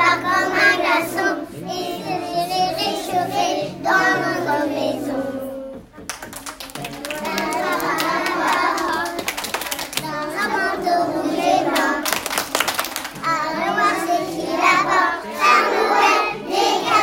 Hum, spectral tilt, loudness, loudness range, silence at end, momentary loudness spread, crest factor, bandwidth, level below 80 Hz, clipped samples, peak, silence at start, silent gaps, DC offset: none; -2.5 dB/octave; -19 LUFS; 6 LU; 0 s; 13 LU; 20 dB; 17 kHz; -54 dBFS; under 0.1%; 0 dBFS; 0 s; none; under 0.1%